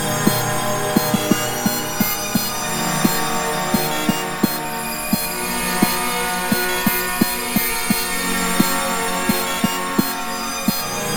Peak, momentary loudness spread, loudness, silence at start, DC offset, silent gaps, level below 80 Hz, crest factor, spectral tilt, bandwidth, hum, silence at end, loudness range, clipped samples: 0 dBFS; 3 LU; -19 LUFS; 0 s; under 0.1%; none; -40 dBFS; 20 dB; -3 dB/octave; 17 kHz; none; 0 s; 1 LU; under 0.1%